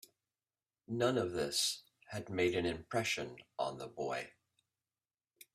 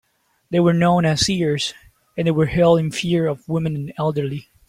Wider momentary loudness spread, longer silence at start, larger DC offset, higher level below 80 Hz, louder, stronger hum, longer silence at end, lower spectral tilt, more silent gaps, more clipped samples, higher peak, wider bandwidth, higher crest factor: first, 13 LU vs 10 LU; first, 0.9 s vs 0.5 s; neither; second, -70 dBFS vs -46 dBFS; second, -37 LUFS vs -19 LUFS; neither; first, 1.25 s vs 0.25 s; second, -3.5 dB/octave vs -5.5 dB/octave; neither; neither; second, -18 dBFS vs -4 dBFS; first, 15.5 kHz vs 12 kHz; first, 22 dB vs 16 dB